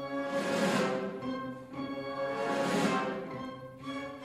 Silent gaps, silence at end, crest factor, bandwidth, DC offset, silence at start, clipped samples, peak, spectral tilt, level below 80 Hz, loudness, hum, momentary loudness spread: none; 0 s; 16 dB; 15 kHz; under 0.1%; 0 s; under 0.1%; -18 dBFS; -5 dB/octave; -68 dBFS; -34 LUFS; none; 12 LU